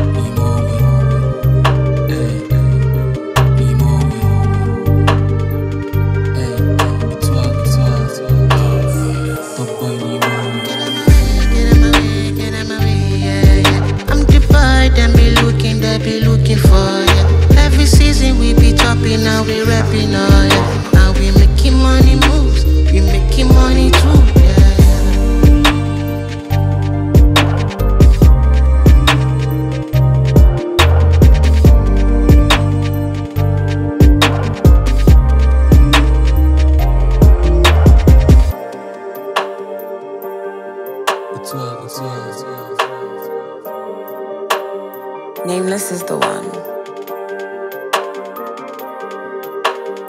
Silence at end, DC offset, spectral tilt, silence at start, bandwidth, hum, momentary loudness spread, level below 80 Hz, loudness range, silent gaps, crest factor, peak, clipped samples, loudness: 0 s; under 0.1%; -6 dB/octave; 0 s; 15 kHz; none; 16 LU; -14 dBFS; 12 LU; none; 10 dB; 0 dBFS; under 0.1%; -12 LUFS